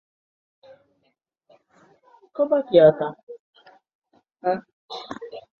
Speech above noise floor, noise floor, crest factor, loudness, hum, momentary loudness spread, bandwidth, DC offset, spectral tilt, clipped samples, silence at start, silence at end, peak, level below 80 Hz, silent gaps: 52 dB; -72 dBFS; 22 dB; -21 LUFS; none; 26 LU; 6.6 kHz; under 0.1%; -7.5 dB/octave; under 0.1%; 2.4 s; 0.2 s; -4 dBFS; -66 dBFS; 3.23-3.27 s, 3.40-3.53 s, 3.95-4.02 s, 4.73-4.89 s